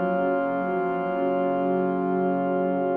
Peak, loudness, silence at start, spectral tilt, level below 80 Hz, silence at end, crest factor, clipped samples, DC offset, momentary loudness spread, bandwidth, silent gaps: -12 dBFS; -25 LUFS; 0 s; -10.5 dB/octave; -70 dBFS; 0 s; 12 dB; under 0.1%; under 0.1%; 2 LU; 4.7 kHz; none